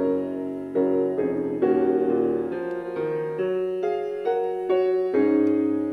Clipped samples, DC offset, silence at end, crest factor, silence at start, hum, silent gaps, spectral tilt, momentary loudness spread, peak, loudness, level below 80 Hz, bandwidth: under 0.1%; under 0.1%; 0 s; 14 dB; 0 s; none; none; -8.5 dB/octave; 7 LU; -8 dBFS; -24 LUFS; -64 dBFS; 4.9 kHz